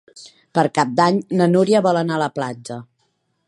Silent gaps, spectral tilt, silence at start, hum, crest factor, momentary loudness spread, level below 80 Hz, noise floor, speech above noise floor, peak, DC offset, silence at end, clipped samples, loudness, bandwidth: none; -6 dB/octave; 0.15 s; none; 18 dB; 14 LU; -66 dBFS; -68 dBFS; 50 dB; 0 dBFS; under 0.1%; 0.65 s; under 0.1%; -18 LUFS; 11.5 kHz